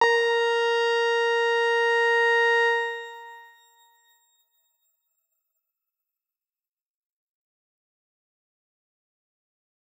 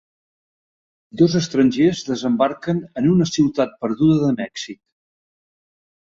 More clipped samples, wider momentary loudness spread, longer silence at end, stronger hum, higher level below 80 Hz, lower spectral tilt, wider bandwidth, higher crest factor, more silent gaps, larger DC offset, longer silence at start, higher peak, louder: neither; about the same, 11 LU vs 10 LU; first, 6.6 s vs 1.35 s; neither; second, under -90 dBFS vs -56 dBFS; second, 1.5 dB/octave vs -6.5 dB/octave; first, 15 kHz vs 7.8 kHz; about the same, 20 dB vs 18 dB; neither; neither; second, 0 s vs 1.15 s; second, -8 dBFS vs -2 dBFS; second, -22 LUFS vs -19 LUFS